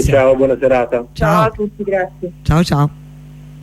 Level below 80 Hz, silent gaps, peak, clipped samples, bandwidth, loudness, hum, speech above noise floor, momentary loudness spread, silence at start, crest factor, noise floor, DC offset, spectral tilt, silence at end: -30 dBFS; none; 0 dBFS; under 0.1%; 14.5 kHz; -15 LUFS; none; 21 dB; 8 LU; 0 s; 14 dB; -35 dBFS; under 0.1%; -7 dB/octave; 0 s